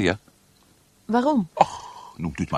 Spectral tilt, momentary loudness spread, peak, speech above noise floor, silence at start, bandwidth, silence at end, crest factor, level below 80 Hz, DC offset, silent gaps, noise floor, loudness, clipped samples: -6 dB/octave; 18 LU; 0 dBFS; 36 dB; 0 s; 13 kHz; 0 s; 24 dB; -52 dBFS; under 0.1%; none; -58 dBFS; -24 LUFS; under 0.1%